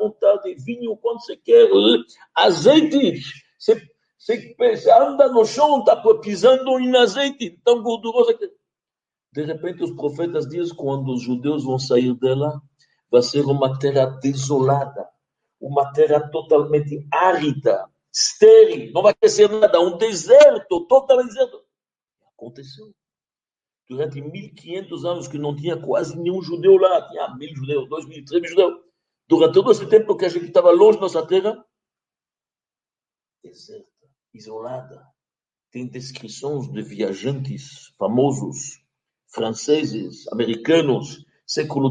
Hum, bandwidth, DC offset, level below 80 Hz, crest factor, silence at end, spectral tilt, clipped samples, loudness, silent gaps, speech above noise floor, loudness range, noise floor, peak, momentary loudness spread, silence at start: none; 9.4 kHz; under 0.1%; -66 dBFS; 18 dB; 0 s; -5 dB/octave; under 0.1%; -18 LUFS; none; over 72 dB; 14 LU; under -90 dBFS; 0 dBFS; 19 LU; 0 s